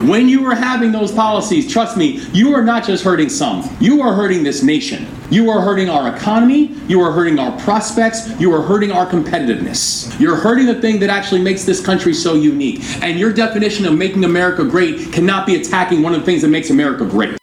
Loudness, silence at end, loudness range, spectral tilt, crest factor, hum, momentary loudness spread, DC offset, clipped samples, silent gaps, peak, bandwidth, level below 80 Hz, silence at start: -14 LUFS; 0.05 s; 1 LU; -5 dB/octave; 12 dB; none; 4 LU; under 0.1%; under 0.1%; none; 0 dBFS; 14 kHz; -46 dBFS; 0 s